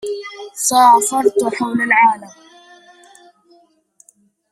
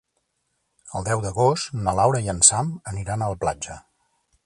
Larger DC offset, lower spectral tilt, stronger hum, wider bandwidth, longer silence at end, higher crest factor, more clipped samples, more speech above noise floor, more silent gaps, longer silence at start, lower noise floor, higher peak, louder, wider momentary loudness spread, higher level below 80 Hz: neither; second, -2 dB/octave vs -3.5 dB/octave; neither; first, 15 kHz vs 11.5 kHz; first, 2.25 s vs 0.65 s; second, 16 dB vs 24 dB; neither; second, 41 dB vs 51 dB; neither; second, 0.05 s vs 0.85 s; second, -55 dBFS vs -74 dBFS; about the same, 0 dBFS vs 0 dBFS; first, -14 LUFS vs -21 LUFS; about the same, 17 LU vs 16 LU; second, -66 dBFS vs -46 dBFS